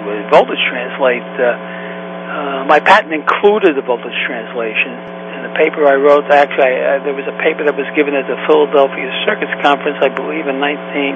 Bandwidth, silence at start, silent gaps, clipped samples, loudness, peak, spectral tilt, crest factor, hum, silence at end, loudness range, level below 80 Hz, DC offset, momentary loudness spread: 8.4 kHz; 0 s; none; 0.2%; -13 LUFS; 0 dBFS; -6 dB/octave; 14 dB; none; 0 s; 2 LU; -64 dBFS; under 0.1%; 11 LU